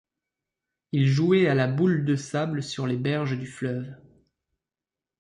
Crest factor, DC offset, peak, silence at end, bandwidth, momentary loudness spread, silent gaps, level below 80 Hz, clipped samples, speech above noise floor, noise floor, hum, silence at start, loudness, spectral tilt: 16 dB; under 0.1%; -10 dBFS; 1.25 s; 10.5 kHz; 11 LU; none; -64 dBFS; under 0.1%; over 66 dB; under -90 dBFS; none; 0.95 s; -25 LUFS; -7 dB/octave